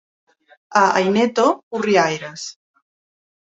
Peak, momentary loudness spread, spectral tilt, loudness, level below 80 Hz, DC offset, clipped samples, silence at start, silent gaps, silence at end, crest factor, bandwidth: -2 dBFS; 15 LU; -4.5 dB/octave; -18 LUFS; -66 dBFS; under 0.1%; under 0.1%; 0.7 s; 1.63-1.71 s; 1 s; 18 dB; 8 kHz